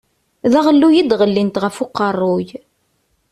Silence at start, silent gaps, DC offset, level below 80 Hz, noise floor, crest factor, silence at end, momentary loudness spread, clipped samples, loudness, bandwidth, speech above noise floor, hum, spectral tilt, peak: 0.45 s; none; under 0.1%; -56 dBFS; -64 dBFS; 14 dB; 0.75 s; 10 LU; under 0.1%; -15 LUFS; 12.5 kHz; 50 dB; none; -6.5 dB/octave; -2 dBFS